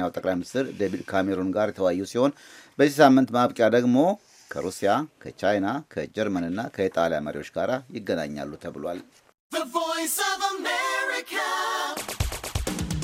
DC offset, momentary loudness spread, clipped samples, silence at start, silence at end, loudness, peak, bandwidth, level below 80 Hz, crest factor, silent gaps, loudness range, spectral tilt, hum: under 0.1%; 13 LU; under 0.1%; 0 s; 0 s; -25 LUFS; -4 dBFS; 16 kHz; -46 dBFS; 22 dB; 9.34-9.50 s; 7 LU; -4.5 dB/octave; none